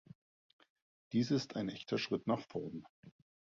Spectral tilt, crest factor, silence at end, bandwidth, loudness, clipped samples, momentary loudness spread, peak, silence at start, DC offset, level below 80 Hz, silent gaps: -5.5 dB/octave; 18 dB; 0.35 s; 7.4 kHz; -38 LUFS; under 0.1%; 10 LU; -22 dBFS; 1.1 s; under 0.1%; -76 dBFS; 2.89-3.03 s